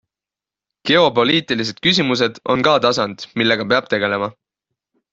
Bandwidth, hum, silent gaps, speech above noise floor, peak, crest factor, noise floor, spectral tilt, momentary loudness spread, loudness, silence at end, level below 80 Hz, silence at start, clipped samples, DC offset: 7.8 kHz; none; none; 72 dB; 0 dBFS; 18 dB; -89 dBFS; -4.5 dB/octave; 8 LU; -16 LUFS; 0.8 s; -56 dBFS; 0.85 s; under 0.1%; under 0.1%